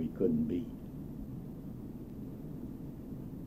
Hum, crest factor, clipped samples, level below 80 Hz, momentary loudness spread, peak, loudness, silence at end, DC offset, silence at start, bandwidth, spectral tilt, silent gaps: none; 20 dB; under 0.1%; -52 dBFS; 13 LU; -18 dBFS; -40 LUFS; 0 s; under 0.1%; 0 s; 15.5 kHz; -10 dB/octave; none